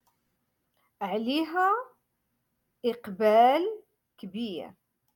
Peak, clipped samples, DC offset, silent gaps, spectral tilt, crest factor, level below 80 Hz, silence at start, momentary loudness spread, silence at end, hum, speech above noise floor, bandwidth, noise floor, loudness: -10 dBFS; under 0.1%; under 0.1%; none; -5.5 dB/octave; 20 dB; -78 dBFS; 1 s; 22 LU; 0.45 s; none; 52 dB; 17.5 kHz; -78 dBFS; -27 LUFS